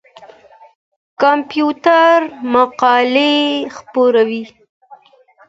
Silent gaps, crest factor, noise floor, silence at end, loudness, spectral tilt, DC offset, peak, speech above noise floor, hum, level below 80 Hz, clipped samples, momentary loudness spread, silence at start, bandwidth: 0.75-1.17 s; 16 dB; -49 dBFS; 1 s; -13 LUFS; -4 dB/octave; under 0.1%; 0 dBFS; 36 dB; none; -64 dBFS; under 0.1%; 9 LU; 0.2 s; 7.8 kHz